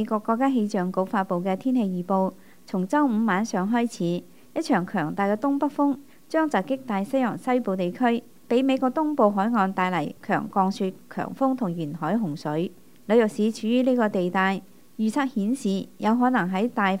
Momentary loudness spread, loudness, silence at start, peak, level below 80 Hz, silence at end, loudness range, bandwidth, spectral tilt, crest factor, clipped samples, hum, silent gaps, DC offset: 8 LU; -25 LUFS; 0 s; -6 dBFS; -72 dBFS; 0 s; 2 LU; 16 kHz; -6.5 dB/octave; 18 dB; under 0.1%; none; none; 0.3%